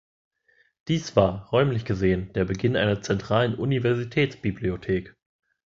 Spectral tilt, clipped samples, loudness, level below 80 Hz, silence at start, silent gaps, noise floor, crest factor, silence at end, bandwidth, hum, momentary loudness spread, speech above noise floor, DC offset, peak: -6.5 dB/octave; under 0.1%; -25 LUFS; -46 dBFS; 0.85 s; none; -65 dBFS; 22 dB; 0.65 s; 7.6 kHz; none; 6 LU; 41 dB; under 0.1%; -4 dBFS